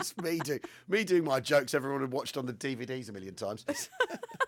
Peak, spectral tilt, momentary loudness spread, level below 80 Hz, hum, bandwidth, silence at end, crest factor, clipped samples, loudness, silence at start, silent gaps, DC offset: -12 dBFS; -4 dB/octave; 11 LU; -78 dBFS; none; 19 kHz; 0 s; 20 dB; under 0.1%; -32 LUFS; 0 s; none; under 0.1%